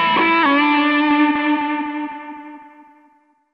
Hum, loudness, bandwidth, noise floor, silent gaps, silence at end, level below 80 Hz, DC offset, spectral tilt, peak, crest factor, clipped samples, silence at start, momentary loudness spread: none; -16 LUFS; 5.6 kHz; -56 dBFS; none; 0.85 s; -60 dBFS; under 0.1%; -6 dB/octave; -4 dBFS; 16 dB; under 0.1%; 0 s; 18 LU